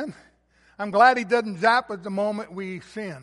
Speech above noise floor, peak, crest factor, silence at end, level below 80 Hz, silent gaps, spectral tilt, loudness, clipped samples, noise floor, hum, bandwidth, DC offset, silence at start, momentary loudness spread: 38 dB; -4 dBFS; 20 dB; 0 s; -66 dBFS; none; -5 dB/octave; -22 LUFS; under 0.1%; -61 dBFS; none; 11.5 kHz; under 0.1%; 0 s; 17 LU